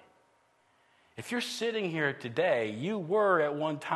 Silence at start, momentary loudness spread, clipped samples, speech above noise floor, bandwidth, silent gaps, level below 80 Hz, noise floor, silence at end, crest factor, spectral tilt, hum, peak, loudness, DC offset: 1.15 s; 9 LU; under 0.1%; 38 dB; 12.5 kHz; none; -80 dBFS; -68 dBFS; 0 s; 18 dB; -5 dB/octave; none; -14 dBFS; -30 LUFS; under 0.1%